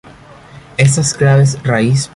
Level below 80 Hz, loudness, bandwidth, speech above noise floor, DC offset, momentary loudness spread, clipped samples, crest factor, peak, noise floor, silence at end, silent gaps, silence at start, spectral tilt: -44 dBFS; -12 LUFS; 11.5 kHz; 27 dB; under 0.1%; 4 LU; under 0.1%; 12 dB; 0 dBFS; -38 dBFS; 0.1 s; none; 0.55 s; -5.5 dB/octave